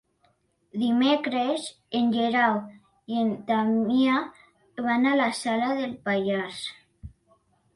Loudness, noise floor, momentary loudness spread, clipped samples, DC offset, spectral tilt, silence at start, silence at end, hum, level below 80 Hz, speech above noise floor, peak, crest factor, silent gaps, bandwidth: -25 LUFS; -68 dBFS; 11 LU; under 0.1%; under 0.1%; -5 dB/octave; 0.75 s; 0.65 s; none; -62 dBFS; 43 dB; -10 dBFS; 16 dB; none; 11.5 kHz